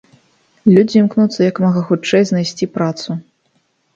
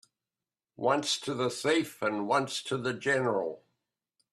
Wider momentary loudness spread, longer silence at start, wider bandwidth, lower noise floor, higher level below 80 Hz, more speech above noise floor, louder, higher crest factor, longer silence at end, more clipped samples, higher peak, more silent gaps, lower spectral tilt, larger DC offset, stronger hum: first, 10 LU vs 5 LU; second, 0.65 s vs 0.8 s; second, 7.6 kHz vs 14 kHz; second, -62 dBFS vs under -90 dBFS; first, -58 dBFS vs -76 dBFS; second, 49 dB vs over 60 dB; first, -15 LUFS vs -30 LUFS; about the same, 16 dB vs 20 dB; about the same, 0.75 s vs 0.75 s; neither; first, 0 dBFS vs -12 dBFS; neither; first, -6.5 dB/octave vs -4 dB/octave; neither; neither